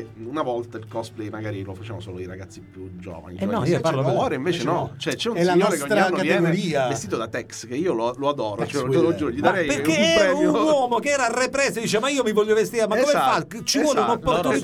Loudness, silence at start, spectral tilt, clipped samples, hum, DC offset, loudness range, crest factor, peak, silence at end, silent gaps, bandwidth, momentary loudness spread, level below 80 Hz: -22 LUFS; 0 s; -4.5 dB/octave; under 0.1%; none; under 0.1%; 7 LU; 18 dB; -4 dBFS; 0 s; none; 16.5 kHz; 15 LU; -54 dBFS